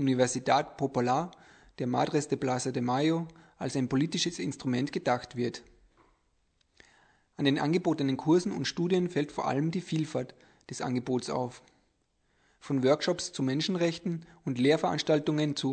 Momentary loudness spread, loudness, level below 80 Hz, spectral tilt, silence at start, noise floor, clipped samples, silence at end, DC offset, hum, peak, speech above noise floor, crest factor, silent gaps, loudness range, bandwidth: 10 LU; -30 LUFS; -66 dBFS; -5.5 dB/octave; 0 s; -73 dBFS; under 0.1%; 0 s; under 0.1%; none; -10 dBFS; 44 dB; 20 dB; none; 5 LU; 9.2 kHz